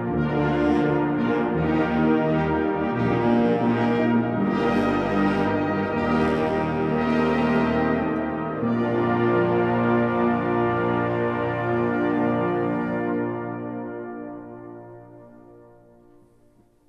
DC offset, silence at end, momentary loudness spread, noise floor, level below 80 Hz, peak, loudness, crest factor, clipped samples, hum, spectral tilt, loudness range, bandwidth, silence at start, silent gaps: under 0.1%; 1.3 s; 8 LU; -57 dBFS; -46 dBFS; -8 dBFS; -23 LUFS; 14 dB; under 0.1%; none; -8.5 dB/octave; 7 LU; 6.8 kHz; 0 s; none